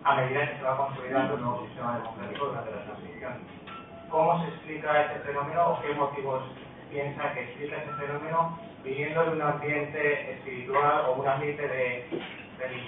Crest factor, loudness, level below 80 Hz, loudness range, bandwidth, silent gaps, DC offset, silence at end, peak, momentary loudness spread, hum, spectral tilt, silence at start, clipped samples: 20 dB; -30 LUFS; -66 dBFS; 4 LU; 4 kHz; none; under 0.1%; 0 s; -10 dBFS; 14 LU; none; -10 dB/octave; 0 s; under 0.1%